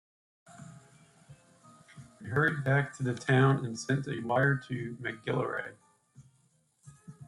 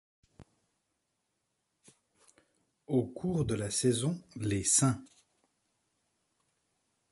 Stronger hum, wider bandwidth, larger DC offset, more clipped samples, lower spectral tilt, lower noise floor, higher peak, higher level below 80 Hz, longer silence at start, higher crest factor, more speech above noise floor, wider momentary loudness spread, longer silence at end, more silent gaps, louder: neither; about the same, 11.5 kHz vs 11.5 kHz; neither; neither; first, -6.5 dB/octave vs -4.5 dB/octave; second, -70 dBFS vs -82 dBFS; about the same, -12 dBFS vs -12 dBFS; second, -68 dBFS vs -60 dBFS; about the same, 0.5 s vs 0.4 s; about the same, 20 dB vs 24 dB; second, 40 dB vs 51 dB; first, 22 LU vs 10 LU; second, 0.05 s vs 2.05 s; neither; about the same, -30 LUFS vs -31 LUFS